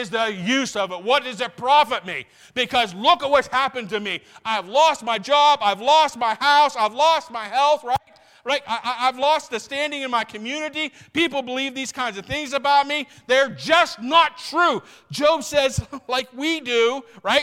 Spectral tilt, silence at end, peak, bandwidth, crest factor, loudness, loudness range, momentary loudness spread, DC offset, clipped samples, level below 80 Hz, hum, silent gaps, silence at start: -3 dB/octave; 0 s; -4 dBFS; 16.5 kHz; 18 dB; -20 LUFS; 5 LU; 10 LU; under 0.1%; under 0.1%; -54 dBFS; none; none; 0 s